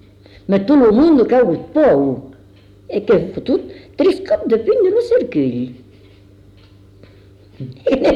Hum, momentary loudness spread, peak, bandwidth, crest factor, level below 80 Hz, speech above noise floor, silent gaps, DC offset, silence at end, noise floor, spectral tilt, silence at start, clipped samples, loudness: 50 Hz at -50 dBFS; 15 LU; -4 dBFS; 9.4 kHz; 12 dB; -46 dBFS; 30 dB; none; under 0.1%; 0 s; -45 dBFS; -8 dB/octave; 0.5 s; under 0.1%; -15 LUFS